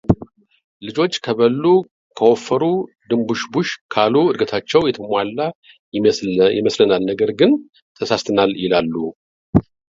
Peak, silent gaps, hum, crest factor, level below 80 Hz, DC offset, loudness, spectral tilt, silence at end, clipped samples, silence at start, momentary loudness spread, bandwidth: 0 dBFS; 0.64-0.80 s, 1.91-2.10 s, 3.81-3.89 s, 5.55-5.62 s, 5.79-5.92 s, 7.82-7.95 s, 9.15-9.53 s; none; 18 dB; -44 dBFS; under 0.1%; -18 LUFS; -6 dB/octave; 0.3 s; under 0.1%; 0.1 s; 8 LU; 7.8 kHz